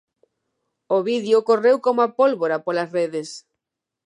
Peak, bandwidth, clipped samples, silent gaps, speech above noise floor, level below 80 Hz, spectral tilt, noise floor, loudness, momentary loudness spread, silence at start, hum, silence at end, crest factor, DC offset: -4 dBFS; 11 kHz; under 0.1%; none; 65 dB; -80 dBFS; -5 dB/octave; -84 dBFS; -20 LUFS; 10 LU; 0.9 s; none; 0.65 s; 16 dB; under 0.1%